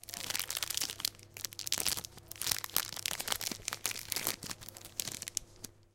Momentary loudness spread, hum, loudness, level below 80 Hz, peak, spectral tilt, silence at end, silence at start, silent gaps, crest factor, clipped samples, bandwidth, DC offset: 10 LU; none; -36 LUFS; -62 dBFS; -8 dBFS; 0 dB/octave; 0.1 s; 0.05 s; none; 32 dB; under 0.1%; 17 kHz; under 0.1%